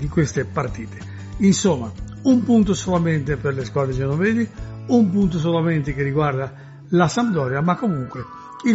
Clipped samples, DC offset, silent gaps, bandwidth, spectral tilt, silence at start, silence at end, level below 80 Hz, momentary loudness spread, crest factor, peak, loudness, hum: under 0.1%; under 0.1%; none; 8 kHz; -7 dB/octave; 0 s; 0 s; -40 dBFS; 15 LU; 18 dB; -2 dBFS; -20 LUFS; none